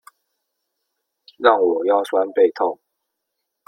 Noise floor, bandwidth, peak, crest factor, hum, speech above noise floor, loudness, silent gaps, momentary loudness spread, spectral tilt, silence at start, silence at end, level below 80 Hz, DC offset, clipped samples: -78 dBFS; 11 kHz; 0 dBFS; 20 dB; none; 61 dB; -18 LUFS; none; 8 LU; -4.5 dB/octave; 1.4 s; 0.95 s; -70 dBFS; under 0.1%; under 0.1%